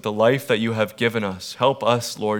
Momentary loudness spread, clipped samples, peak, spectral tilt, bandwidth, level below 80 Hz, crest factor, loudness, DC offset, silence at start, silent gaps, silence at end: 5 LU; under 0.1%; -4 dBFS; -5 dB/octave; 19.5 kHz; -66 dBFS; 18 dB; -21 LUFS; under 0.1%; 0.05 s; none; 0 s